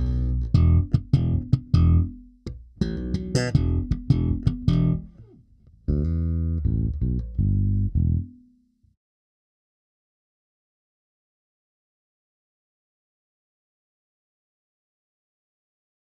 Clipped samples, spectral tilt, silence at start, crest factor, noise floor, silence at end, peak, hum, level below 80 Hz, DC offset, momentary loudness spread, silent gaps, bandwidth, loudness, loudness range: under 0.1%; -8 dB/octave; 0 s; 20 dB; -61 dBFS; 7.75 s; -6 dBFS; none; -32 dBFS; under 0.1%; 10 LU; none; 9 kHz; -24 LUFS; 6 LU